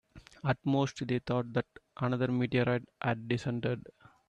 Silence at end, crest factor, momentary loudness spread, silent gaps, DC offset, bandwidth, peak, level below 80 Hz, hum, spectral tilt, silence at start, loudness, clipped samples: 0.5 s; 18 dB; 7 LU; none; under 0.1%; 8.6 kHz; -14 dBFS; -64 dBFS; none; -7 dB/octave; 0.15 s; -33 LUFS; under 0.1%